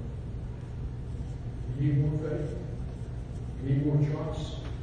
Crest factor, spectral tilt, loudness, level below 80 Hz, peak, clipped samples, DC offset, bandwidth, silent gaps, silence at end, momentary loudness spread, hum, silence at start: 16 dB; -9 dB/octave; -32 LUFS; -40 dBFS; -16 dBFS; under 0.1%; under 0.1%; 9.2 kHz; none; 0 s; 12 LU; none; 0 s